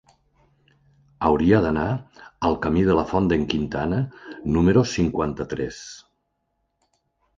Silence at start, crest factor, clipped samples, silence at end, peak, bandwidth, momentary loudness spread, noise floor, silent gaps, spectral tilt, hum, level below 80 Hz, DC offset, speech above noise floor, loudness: 1.2 s; 20 dB; under 0.1%; 1.4 s; -4 dBFS; 7.6 kHz; 13 LU; -74 dBFS; none; -7 dB/octave; none; -40 dBFS; under 0.1%; 52 dB; -22 LUFS